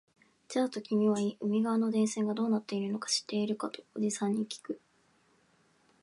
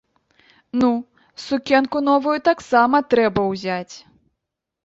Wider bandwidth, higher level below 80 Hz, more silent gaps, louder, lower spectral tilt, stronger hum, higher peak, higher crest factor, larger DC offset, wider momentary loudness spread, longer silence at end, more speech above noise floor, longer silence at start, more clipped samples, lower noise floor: first, 11.5 kHz vs 8 kHz; second, -82 dBFS vs -56 dBFS; neither; second, -32 LUFS vs -19 LUFS; about the same, -5 dB/octave vs -5.5 dB/octave; neither; second, -18 dBFS vs -2 dBFS; about the same, 16 dB vs 18 dB; neither; second, 9 LU vs 12 LU; first, 1.25 s vs 0.85 s; second, 38 dB vs 62 dB; second, 0.5 s vs 0.75 s; neither; second, -69 dBFS vs -81 dBFS